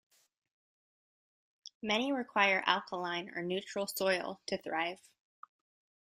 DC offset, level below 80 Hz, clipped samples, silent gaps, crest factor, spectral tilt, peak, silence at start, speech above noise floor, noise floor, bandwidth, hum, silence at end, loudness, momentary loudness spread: under 0.1%; -80 dBFS; under 0.1%; none; 26 dB; -3.5 dB/octave; -12 dBFS; 1.85 s; over 56 dB; under -90 dBFS; 15.5 kHz; none; 1.1 s; -34 LUFS; 13 LU